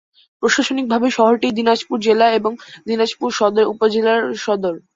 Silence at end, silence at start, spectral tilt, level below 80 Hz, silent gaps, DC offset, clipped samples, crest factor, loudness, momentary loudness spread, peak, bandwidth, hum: 0.2 s; 0.4 s; -4 dB/octave; -62 dBFS; none; under 0.1%; under 0.1%; 16 dB; -17 LUFS; 6 LU; -2 dBFS; 7.8 kHz; none